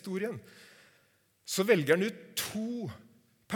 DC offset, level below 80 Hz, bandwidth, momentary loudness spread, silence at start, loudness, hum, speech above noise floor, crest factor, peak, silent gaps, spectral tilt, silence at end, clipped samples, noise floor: under 0.1%; -74 dBFS; 19 kHz; 20 LU; 0.05 s; -31 LUFS; none; 38 dB; 22 dB; -12 dBFS; none; -4.5 dB/octave; 0 s; under 0.1%; -69 dBFS